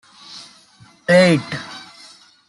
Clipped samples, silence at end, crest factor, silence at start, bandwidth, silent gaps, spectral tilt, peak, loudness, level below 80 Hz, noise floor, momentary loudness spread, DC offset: under 0.1%; 0.7 s; 18 dB; 0.3 s; 11.5 kHz; none; -5.5 dB/octave; -2 dBFS; -16 LUFS; -62 dBFS; -49 dBFS; 25 LU; under 0.1%